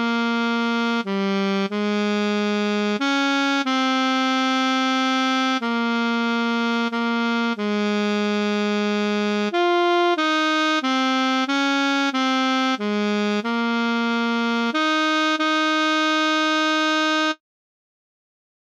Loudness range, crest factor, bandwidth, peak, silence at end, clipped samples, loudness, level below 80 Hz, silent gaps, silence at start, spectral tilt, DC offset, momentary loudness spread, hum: 2 LU; 12 dB; 11 kHz; -10 dBFS; 1.35 s; under 0.1%; -21 LUFS; -82 dBFS; none; 0 s; -4 dB/octave; under 0.1%; 3 LU; none